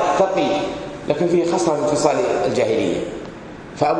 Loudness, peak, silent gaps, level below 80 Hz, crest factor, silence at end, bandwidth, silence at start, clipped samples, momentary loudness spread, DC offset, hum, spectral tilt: -19 LUFS; 0 dBFS; none; -48 dBFS; 18 dB; 0 s; 10 kHz; 0 s; under 0.1%; 13 LU; under 0.1%; none; -5 dB/octave